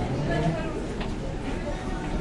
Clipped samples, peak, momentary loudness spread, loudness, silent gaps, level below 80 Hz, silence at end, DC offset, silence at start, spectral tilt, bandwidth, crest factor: under 0.1%; -14 dBFS; 6 LU; -30 LUFS; none; -34 dBFS; 0 s; under 0.1%; 0 s; -6.5 dB/octave; 11.5 kHz; 14 dB